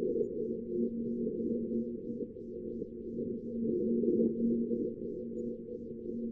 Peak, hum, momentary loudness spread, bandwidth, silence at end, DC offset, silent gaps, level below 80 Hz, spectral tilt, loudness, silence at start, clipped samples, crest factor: -18 dBFS; none; 11 LU; 0.7 kHz; 0 s; under 0.1%; none; -60 dBFS; -13 dB/octave; -36 LUFS; 0 s; under 0.1%; 16 dB